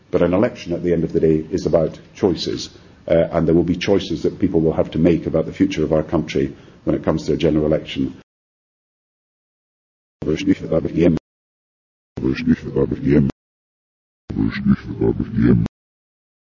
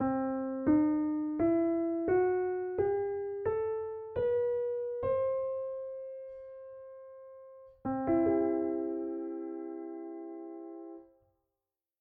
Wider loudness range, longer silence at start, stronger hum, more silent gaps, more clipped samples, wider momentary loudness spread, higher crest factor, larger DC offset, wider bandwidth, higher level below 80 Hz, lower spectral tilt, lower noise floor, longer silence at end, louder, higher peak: about the same, 5 LU vs 7 LU; first, 0.15 s vs 0 s; neither; first, 8.23-10.20 s, 11.20-12.16 s, 13.32-14.28 s vs none; neither; second, 8 LU vs 19 LU; about the same, 18 dB vs 16 dB; neither; first, 7.4 kHz vs 3.3 kHz; first, -38 dBFS vs -64 dBFS; about the same, -7.5 dB/octave vs -8.5 dB/octave; about the same, under -90 dBFS vs under -90 dBFS; about the same, 0.9 s vs 0.95 s; first, -19 LUFS vs -32 LUFS; first, -2 dBFS vs -18 dBFS